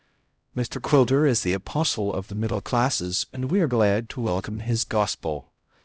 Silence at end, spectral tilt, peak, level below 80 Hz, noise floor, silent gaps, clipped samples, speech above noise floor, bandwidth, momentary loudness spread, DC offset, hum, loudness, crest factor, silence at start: 0.45 s; -5 dB/octave; -6 dBFS; -46 dBFS; -69 dBFS; none; under 0.1%; 45 dB; 8 kHz; 9 LU; under 0.1%; none; -24 LUFS; 18 dB; 0.55 s